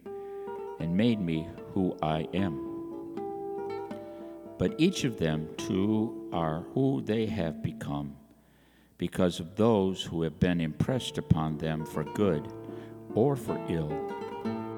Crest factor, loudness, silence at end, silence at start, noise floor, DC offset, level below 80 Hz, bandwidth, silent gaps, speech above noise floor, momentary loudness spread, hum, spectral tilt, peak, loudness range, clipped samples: 22 dB; -31 LUFS; 0 s; 0.05 s; -61 dBFS; under 0.1%; -54 dBFS; 19 kHz; none; 32 dB; 12 LU; none; -7 dB/octave; -8 dBFS; 4 LU; under 0.1%